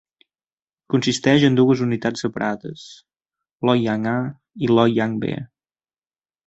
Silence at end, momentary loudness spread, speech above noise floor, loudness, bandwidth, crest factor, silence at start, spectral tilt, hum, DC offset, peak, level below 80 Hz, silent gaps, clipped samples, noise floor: 1 s; 15 LU; over 71 dB; -20 LUFS; 8.2 kHz; 18 dB; 0.9 s; -6 dB/octave; none; under 0.1%; -2 dBFS; -58 dBFS; 3.53-3.58 s; under 0.1%; under -90 dBFS